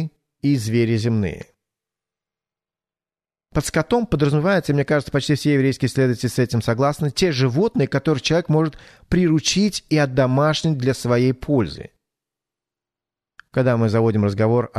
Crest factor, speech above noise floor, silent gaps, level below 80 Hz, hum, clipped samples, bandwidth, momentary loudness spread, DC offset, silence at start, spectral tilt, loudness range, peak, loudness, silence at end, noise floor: 16 dB; over 71 dB; none; -46 dBFS; none; under 0.1%; 13.5 kHz; 6 LU; under 0.1%; 0 s; -6 dB/octave; 6 LU; -4 dBFS; -20 LUFS; 0 s; under -90 dBFS